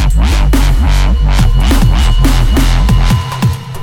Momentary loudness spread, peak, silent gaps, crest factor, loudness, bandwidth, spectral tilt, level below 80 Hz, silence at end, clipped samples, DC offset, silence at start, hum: 2 LU; 0 dBFS; none; 8 dB; -11 LUFS; 16 kHz; -5.5 dB/octave; -10 dBFS; 0 s; under 0.1%; under 0.1%; 0 s; none